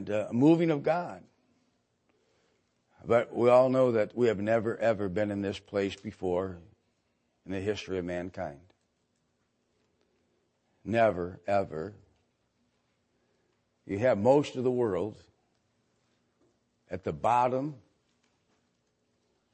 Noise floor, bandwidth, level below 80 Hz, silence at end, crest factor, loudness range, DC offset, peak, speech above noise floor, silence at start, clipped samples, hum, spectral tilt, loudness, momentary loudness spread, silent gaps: -76 dBFS; 8.8 kHz; -68 dBFS; 1.75 s; 20 dB; 11 LU; under 0.1%; -10 dBFS; 48 dB; 0 s; under 0.1%; none; -7.5 dB/octave; -28 LUFS; 16 LU; none